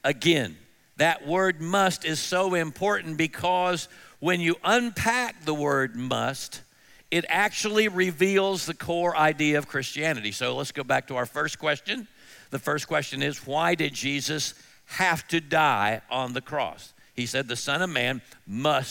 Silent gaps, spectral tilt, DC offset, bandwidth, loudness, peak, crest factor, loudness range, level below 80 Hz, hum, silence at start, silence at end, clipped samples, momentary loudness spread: none; -4 dB/octave; under 0.1%; 17 kHz; -26 LUFS; -8 dBFS; 18 dB; 4 LU; -64 dBFS; none; 0.05 s; 0 s; under 0.1%; 9 LU